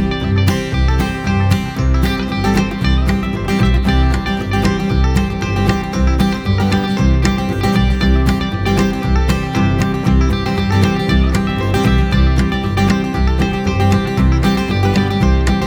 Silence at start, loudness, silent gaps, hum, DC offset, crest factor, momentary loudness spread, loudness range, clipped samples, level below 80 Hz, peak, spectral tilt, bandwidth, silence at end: 0 s; -15 LUFS; none; none; under 0.1%; 14 dB; 3 LU; 1 LU; under 0.1%; -18 dBFS; 0 dBFS; -6.5 dB/octave; 18.5 kHz; 0 s